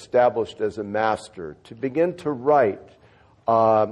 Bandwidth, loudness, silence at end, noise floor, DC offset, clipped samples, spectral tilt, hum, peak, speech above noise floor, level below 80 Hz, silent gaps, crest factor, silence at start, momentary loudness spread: 11 kHz; -22 LUFS; 0 s; -54 dBFS; under 0.1%; under 0.1%; -6.5 dB/octave; none; -6 dBFS; 32 dB; -58 dBFS; none; 16 dB; 0 s; 17 LU